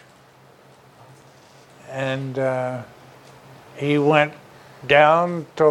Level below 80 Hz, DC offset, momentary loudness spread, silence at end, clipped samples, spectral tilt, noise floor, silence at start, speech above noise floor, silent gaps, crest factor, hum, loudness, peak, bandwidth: -64 dBFS; under 0.1%; 20 LU; 0 s; under 0.1%; -6.5 dB/octave; -51 dBFS; 1.9 s; 32 dB; none; 22 dB; none; -20 LUFS; 0 dBFS; 12.5 kHz